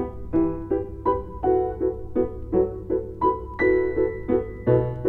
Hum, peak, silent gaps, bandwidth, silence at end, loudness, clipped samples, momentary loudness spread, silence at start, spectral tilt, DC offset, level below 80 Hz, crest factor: none; -8 dBFS; none; 4.2 kHz; 0 s; -24 LUFS; under 0.1%; 5 LU; 0 s; -11 dB/octave; under 0.1%; -38 dBFS; 16 dB